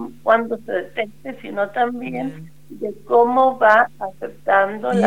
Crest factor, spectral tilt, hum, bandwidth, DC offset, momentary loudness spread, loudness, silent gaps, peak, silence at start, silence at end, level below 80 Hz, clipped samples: 20 dB; -6.5 dB/octave; none; 15.5 kHz; 0.8%; 16 LU; -19 LUFS; none; 0 dBFS; 0 s; 0 s; -62 dBFS; under 0.1%